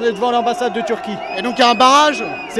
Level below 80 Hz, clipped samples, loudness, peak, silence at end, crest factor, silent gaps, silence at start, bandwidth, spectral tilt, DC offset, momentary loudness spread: -56 dBFS; under 0.1%; -15 LUFS; 0 dBFS; 0 s; 16 dB; none; 0 s; 13.5 kHz; -2.5 dB/octave; under 0.1%; 12 LU